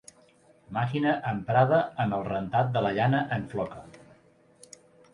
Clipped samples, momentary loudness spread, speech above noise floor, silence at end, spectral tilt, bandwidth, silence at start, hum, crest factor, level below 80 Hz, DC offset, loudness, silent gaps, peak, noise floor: under 0.1%; 11 LU; 33 dB; 1.15 s; -7.5 dB/octave; 11.5 kHz; 0.7 s; none; 18 dB; -60 dBFS; under 0.1%; -27 LUFS; none; -10 dBFS; -60 dBFS